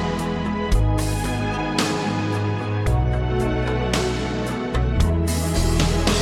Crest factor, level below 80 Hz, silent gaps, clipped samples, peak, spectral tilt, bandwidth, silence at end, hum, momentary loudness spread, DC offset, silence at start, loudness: 12 dB; -26 dBFS; none; under 0.1%; -8 dBFS; -5.5 dB/octave; 17 kHz; 0 s; none; 4 LU; under 0.1%; 0 s; -22 LUFS